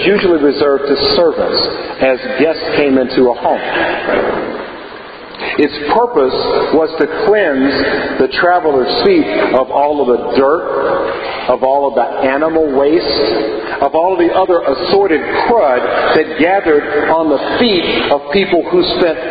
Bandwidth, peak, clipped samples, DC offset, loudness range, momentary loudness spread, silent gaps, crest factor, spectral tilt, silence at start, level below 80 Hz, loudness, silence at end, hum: 5 kHz; 0 dBFS; under 0.1%; under 0.1%; 3 LU; 4 LU; none; 12 dB; -8 dB/octave; 0 s; -42 dBFS; -12 LUFS; 0 s; none